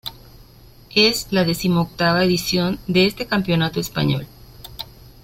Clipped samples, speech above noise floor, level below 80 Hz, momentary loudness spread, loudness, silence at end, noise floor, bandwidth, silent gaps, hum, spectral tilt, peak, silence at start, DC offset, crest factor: under 0.1%; 27 dB; -44 dBFS; 18 LU; -19 LUFS; 0.3 s; -46 dBFS; 16.5 kHz; none; none; -5 dB/octave; -2 dBFS; 0.05 s; under 0.1%; 18 dB